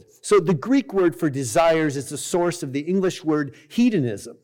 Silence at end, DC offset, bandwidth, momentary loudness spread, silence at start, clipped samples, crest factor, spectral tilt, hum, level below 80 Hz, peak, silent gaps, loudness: 0.1 s; under 0.1%; 17.5 kHz; 6 LU; 0.25 s; under 0.1%; 12 dB; -5.5 dB/octave; none; -56 dBFS; -10 dBFS; none; -22 LUFS